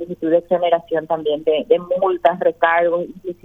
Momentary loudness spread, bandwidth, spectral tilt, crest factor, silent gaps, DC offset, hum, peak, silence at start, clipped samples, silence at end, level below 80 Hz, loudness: 5 LU; 3.9 kHz; -7.5 dB/octave; 18 dB; none; under 0.1%; none; 0 dBFS; 0 s; under 0.1%; 0.1 s; -60 dBFS; -18 LUFS